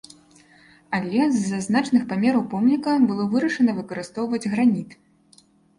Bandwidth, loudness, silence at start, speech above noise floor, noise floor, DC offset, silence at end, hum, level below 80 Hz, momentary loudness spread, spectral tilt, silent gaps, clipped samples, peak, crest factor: 11 kHz; -22 LUFS; 0.9 s; 35 dB; -56 dBFS; under 0.1%; 0.85 s; none; -62 dBFS; 9 LU; -6 dB/octave; none; under 0.1%; -8 dBFS; 14 dB